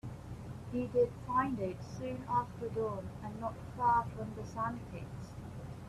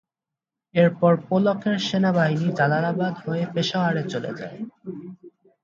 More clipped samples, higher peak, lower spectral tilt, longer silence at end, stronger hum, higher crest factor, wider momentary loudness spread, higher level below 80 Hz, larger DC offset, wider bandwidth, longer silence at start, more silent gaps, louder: neither; second, -18 dBFS vs -6 dBFS; about the same, -7.5 dB/octave vs -6.5 dB/octave; second, 0 s vs 0.35 s; neither; about the same, 18 dB vs 18 dB; about the same, 15 LU vs 16 LU; first, -56 dBFS vs -68 dBFS; neither; first, 13.5 kHz vs 7.4 kHz; second, 0.05 s vs 0.75 s; neither; second, -37 LUFS vs -22 LUFS